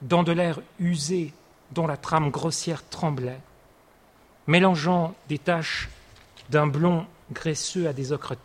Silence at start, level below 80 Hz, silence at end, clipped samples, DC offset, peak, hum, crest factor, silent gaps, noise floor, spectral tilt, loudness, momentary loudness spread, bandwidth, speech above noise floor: 0 s; -54 dBFS; 0.05 s; under 0.1%; under 0.1%; -6 dBFS; none; 20 dB; none; -57 dBFS; -5.5 dB/octave; -25 LUFS; 11 LU; 12 kHz; 32 dB